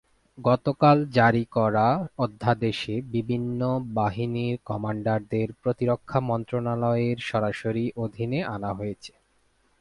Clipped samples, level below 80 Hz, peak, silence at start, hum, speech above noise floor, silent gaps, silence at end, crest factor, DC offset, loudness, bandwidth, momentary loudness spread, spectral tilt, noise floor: under 0.1%; -56 dBFS; -6 dBFS; 0.35 s; none; 41 dB; none; 0.7 s; 20 dB; under 0.1%; -26 LUFS; 11 kHz; 10 LU; -8 dB/octave; -66 dBFS